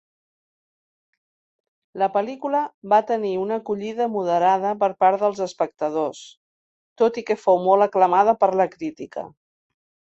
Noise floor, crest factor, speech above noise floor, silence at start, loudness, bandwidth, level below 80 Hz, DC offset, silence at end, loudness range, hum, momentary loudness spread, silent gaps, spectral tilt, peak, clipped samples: under -90 dBFS; 18 dB; over 69 dB; 1.95 s; -21 LUFS; 8.2 kHz; -70 dBFS; under 0.1%; 0.9 s; 4 LU; none; 13 LU; 2.74-2.82 s, 6.37-6.96 s; -6 dB/octave; -4 dBFS; under 0.1%